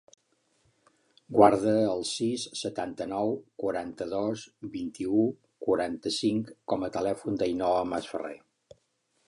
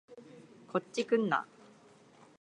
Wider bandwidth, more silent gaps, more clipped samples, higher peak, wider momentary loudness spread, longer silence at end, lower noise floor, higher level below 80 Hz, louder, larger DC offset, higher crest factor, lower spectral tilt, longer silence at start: about the same, 11.5 kHz vs 10.5 kHz; neither; neither; first, -4 dBFS vs -16 dBFS; second, 13 LU vs 25 LU; about the same, 0.9 s vs 0.95 s; first, -73 dBFS vs -60 dBFS; first, -64 dBFS vs -86 dBFS; first, -29 LUFS vs -33 LUFS; neither; about the same, 24 dB vs 20 dB; about the same, -5 dB/octave vs -5.5 dB/octave; first, 1.3 s vs 0.1 s